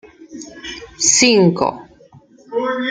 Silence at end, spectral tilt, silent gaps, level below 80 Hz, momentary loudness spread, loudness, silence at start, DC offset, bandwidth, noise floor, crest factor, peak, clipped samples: 0 s; -3 dB/octave; none; -54 dBFS; 21 LU; -14 LUFS; 0.2 s; under 0.1%; 10 kHz; -46 dBFS; 18 dB; -2 dBFS; under 0.1%